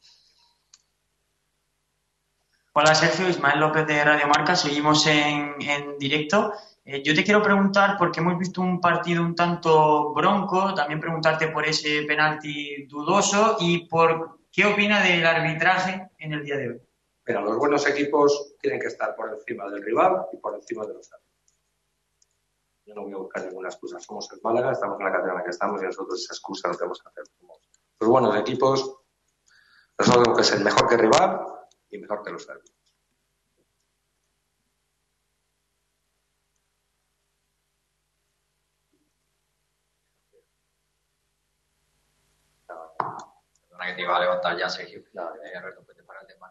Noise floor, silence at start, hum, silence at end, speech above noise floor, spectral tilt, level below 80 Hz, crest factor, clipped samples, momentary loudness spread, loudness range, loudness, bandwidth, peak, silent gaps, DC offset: -75 dBFS; 2.75 s; 50 Hz at -55 dBFS; 0.05 s; 52 dB; -4 dB/octave; -64 dBFS; 22 dB; under 0.1%; 17 LU; 12 LU; -22 LUFS; 8.4 kHz; -4 dBFS; none; under 0.1%